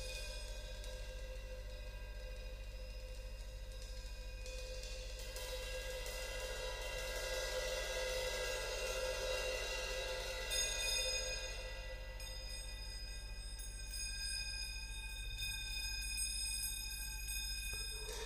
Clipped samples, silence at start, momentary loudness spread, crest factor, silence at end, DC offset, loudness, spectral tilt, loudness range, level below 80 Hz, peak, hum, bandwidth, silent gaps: under 0.1%; 0 s; 12 LU; 18 dB; 0 s; under 0.1%; -43 LUFS; -1.5 dB/octave; 11 LU; -48 dBFS; -26 dBFS; 50 Hz at -50 dBFS; 15.5 kHz; none